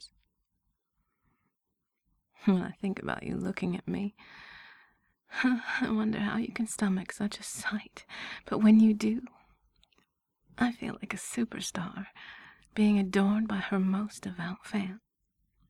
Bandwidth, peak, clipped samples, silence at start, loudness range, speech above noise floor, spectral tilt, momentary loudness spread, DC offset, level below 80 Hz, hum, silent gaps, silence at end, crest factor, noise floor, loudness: 13 kHz; -12 dBFS; under 0.1%; 0 s; 7 LU; 54 dB; -5.5 dB/octave; 18 LU; under 0.1%; -64 dBFS; none; none; 0.7 s; 20 dB; -84 dBFS; -31 LUFS